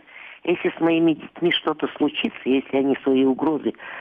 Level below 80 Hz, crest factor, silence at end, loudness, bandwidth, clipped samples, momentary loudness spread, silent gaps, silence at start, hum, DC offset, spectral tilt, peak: -64 dBFS; 12 dB; 0 s; -22 LUFS; 3.8 kHz; under 0.1%; 7 LU; none; 0.15 s; none; under 0.1%; -8 dB/octave; -10 dBFS